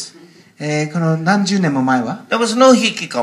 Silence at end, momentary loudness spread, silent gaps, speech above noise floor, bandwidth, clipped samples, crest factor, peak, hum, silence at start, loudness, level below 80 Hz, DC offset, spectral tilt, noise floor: 0 s; 10 LU; none; 29 dB; 12.5 kHz; under 0.1%; 16 dB; 0 dBFS; none; 0 s; -15 LUFS; -66 dBFS; under 0.1%; -5 dB/octave; -44 dBFS